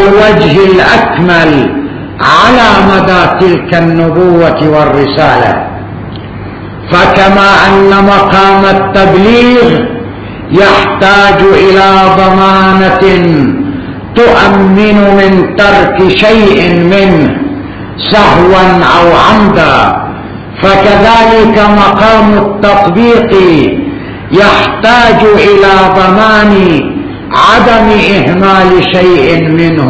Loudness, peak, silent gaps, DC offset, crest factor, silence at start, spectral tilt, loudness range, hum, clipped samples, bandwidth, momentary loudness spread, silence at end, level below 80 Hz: -5 LUFS; 0 dBFS; none; under 0.1%; 4 dB; 0 s; -6.5 dB/octave; 2 LU; none; 10%; 8 kHz; 11 LU; 0 s; -26 dBFS